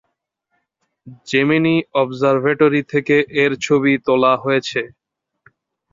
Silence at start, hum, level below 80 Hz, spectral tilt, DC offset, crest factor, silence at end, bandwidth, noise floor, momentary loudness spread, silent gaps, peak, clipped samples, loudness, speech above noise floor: 1.05 s; none; -60 dBFS; -6 dB/octave; under 0.1%; 16 dB; 1.05 s; 7.6 kHz; -73 dBFS; 5 LU; none; -2 dBFS; under 0.1%; -16 LUFS; 57 dB